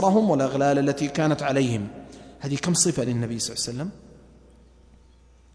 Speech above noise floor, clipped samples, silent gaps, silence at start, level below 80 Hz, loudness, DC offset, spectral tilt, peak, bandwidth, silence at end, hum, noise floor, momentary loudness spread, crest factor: 31 dB; under 0.1%; none; 0 s; -54 dBFS; -24 LUFS; under 0.1%; -4.5 dB/octave; -6 dBFS; 11 kHz; 1.55 s; none; -54 dBFS; 15 LU; 18 dB